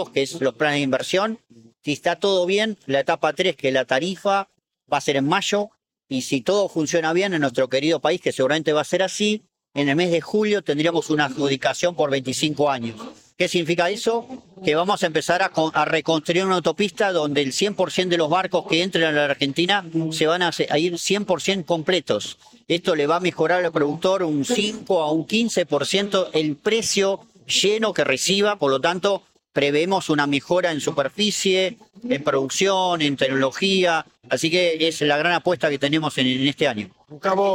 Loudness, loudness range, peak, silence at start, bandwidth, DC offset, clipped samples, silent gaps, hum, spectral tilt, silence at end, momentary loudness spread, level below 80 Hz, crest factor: -21 LUFS; 2 LU; -4 dBFS; 0 s; 17 kHz; under 0.1%; under 0.1%; none; none; -4 dB/octave; 0 s; 5 LU; -66 dBFS; 18 dB